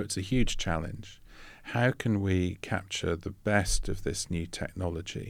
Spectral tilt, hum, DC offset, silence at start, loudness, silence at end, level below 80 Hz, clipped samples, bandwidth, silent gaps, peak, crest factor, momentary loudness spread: -5 dB/octave; none; under 0.1%; 0 s; -31 LUFS; 0 s; -40 dBFS; under 0.1%; 15.5 kHz; none; -12 dBFS; 20 dB; 14 LU